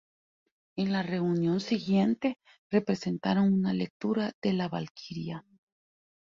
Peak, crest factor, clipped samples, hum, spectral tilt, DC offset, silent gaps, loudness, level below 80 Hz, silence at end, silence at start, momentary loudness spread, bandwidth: -12 dBFS; 18 dB; under 0.1%; none; -7.5 dB/octave; under 0.1%; 2.58-2.70 s, 3.90-4.00 s, 4.34-4.42 s, 4.91-4.95 s; -30 LUFS; -68 dBFS; 0.9 s; 0.75 s; 13 LU; 7.4 kHz